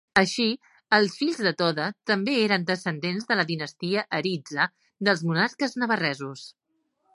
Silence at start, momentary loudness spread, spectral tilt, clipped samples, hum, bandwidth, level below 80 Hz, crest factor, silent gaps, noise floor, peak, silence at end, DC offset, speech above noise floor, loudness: 0.15 s; 7 LU; -4.5 dB/octave; under 0.1%; none; 11.5 kHz; -70 dBFS; 24 dB; none; -72 dBFS; -2 dBFS; 0.65 s; under 0.1%; 47 dB; -25 LUFS